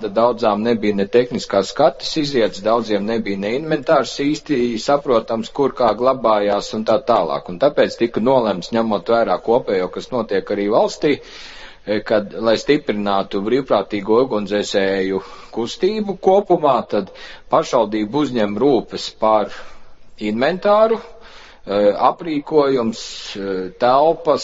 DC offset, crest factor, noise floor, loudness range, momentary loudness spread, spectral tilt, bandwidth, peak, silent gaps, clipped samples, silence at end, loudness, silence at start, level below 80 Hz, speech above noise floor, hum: under 0.1%; 18 dB; -40 dBFS; 2 LU; 9 LU; -5.5 dB/octave; 8 kHz; 0 dBFS; none; under 0.1%; 0 s; -18 LUFS; 0 s; -50 dBFS; 22 dB; none